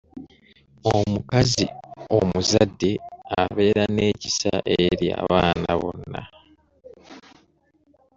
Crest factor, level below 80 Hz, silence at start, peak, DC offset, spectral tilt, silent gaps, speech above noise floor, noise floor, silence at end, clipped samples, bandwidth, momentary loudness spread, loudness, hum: 20 dB; -48 dBFS; 0.15 s; -2 dBFS; under 0.1%; -5 dB/octave; none; 41 dB; -62 dBFS; 0.95 s; under 0.1%; 8 kHz; 12 LU; -22 LUFS; none